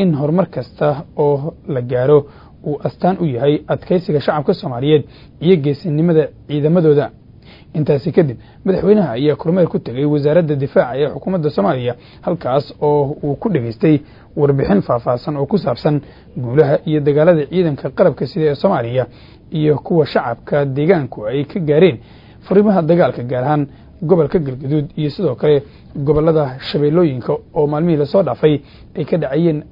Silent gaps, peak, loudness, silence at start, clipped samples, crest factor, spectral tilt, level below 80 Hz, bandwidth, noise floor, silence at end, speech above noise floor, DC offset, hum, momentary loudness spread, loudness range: none; 0 dBFS; -16 LUFS; 0 s; under 0.1%; 16 dB; -10.5 dB/octave; -44 dBFS; 5.4 kHz; -41 dBFS; 0.05 s; 26 dB; under 0.1%; none; 9 LU; 2 LU